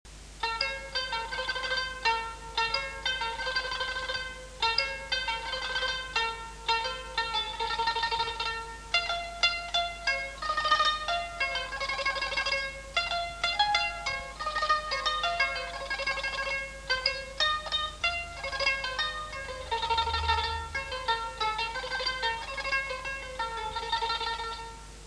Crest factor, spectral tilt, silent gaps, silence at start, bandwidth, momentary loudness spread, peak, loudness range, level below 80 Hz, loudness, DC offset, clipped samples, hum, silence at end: 22 dB; -1.5 dB/octave; none; 0.05 s; 11 kHz; 7 LU; -10 dBFS; 2 LU; -48 dBFS; -30 LUFS; under 0.1%; under 0.1%; none; 0 s